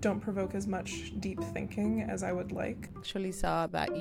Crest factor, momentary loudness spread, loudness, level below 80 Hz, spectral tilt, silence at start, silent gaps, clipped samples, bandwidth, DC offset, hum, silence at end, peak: 18 dB; 6 LU; -35 LUFS; -50 dBFS; -5.5 dB/octave; 0 s; none; under 0.1%; 16 kHz; under 0.1%; none; 0 s; -16 dBFS